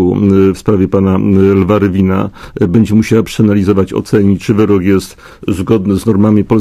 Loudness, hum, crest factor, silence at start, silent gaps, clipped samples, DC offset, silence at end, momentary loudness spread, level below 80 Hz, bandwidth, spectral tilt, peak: -11 LUFS; none; 10 dB; 0 s; none; 0.3%; under 0.1%; 0 s; 7 LU; -30 dBFS; 14.5 kHz; -8 dB/octave; 0 dBFS